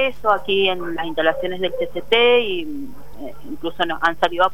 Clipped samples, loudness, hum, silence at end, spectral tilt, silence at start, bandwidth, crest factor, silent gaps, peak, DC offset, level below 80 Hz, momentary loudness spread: under 0.1%; -19 LUFS; 50 Hz at -45 dBFS; 0.05 s; -4.5 dB/octave; 0 s; 16 kHz; 18 dB; none; -4 dBFS; 4%; -48 dBFS; 18 LU